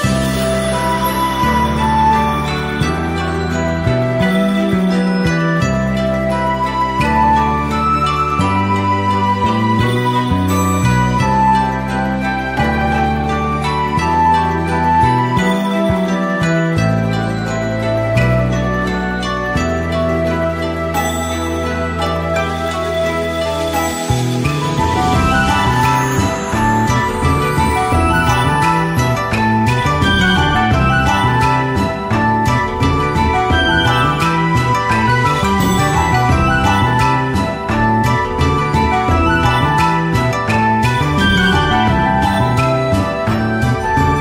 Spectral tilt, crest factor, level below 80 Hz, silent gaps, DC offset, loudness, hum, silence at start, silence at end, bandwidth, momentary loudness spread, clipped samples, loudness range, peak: -5.5 dB/octave; 12 dB; -28 dBFS; none; under 0.1%; -15 LUFS; none; 0 s; 0 s; 16 kHz; 5 LU; under 0.1%; 3 LU; -2 dBFS